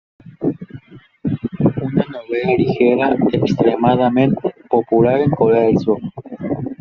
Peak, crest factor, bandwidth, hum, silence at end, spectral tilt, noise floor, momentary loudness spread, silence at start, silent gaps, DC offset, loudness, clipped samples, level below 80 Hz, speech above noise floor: -2 dBFS; 14 dB; 6.8 kHz; none; 0.05 s; -7 dB/octave; -39 dBFS; 10 LU; 0.25 s; none; under 0.1%; -17 LUFS; under 0.1%; -50 dBFS; 25 dB